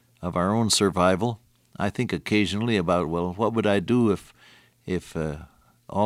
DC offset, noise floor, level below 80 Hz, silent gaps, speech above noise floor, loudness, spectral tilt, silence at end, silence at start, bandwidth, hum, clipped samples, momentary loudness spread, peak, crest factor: under 0.1%; -55 dBFS; -50 dBFS; none; 32 dB; -24 LUFS; -5 dB/octave; 0 s; 0.2 s; 15.5 kHz; none; under 0.1%; 11 LU; -6 dBFS; 18 dB